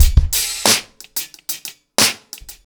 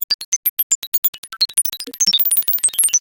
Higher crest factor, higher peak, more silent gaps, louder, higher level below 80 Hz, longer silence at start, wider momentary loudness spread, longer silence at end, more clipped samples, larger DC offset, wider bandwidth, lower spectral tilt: about the same, 18 dB vs 18 dB; about the same, 0 dBFS vs -2 dBFS; second, none vs 0.04-0.08 s, 0.14-0.19 s, 0.25-0.43 s, 0.49-0.57 s, 0.63-0.92 s, 0.98-1.02 s, 1.08-1.23 s; about the same, -17 LUFS vs -15 LUFS; first, -22 dBFS vs -66 dBFS; about the same, 0 s vs 0 s; first, 13 LU vs 6 LU; first, 0.15 s vs 0 s; neither; neither; first, over 20 kHz vs 18 kHz; first, -2 dB/octave vs 3 dB/octave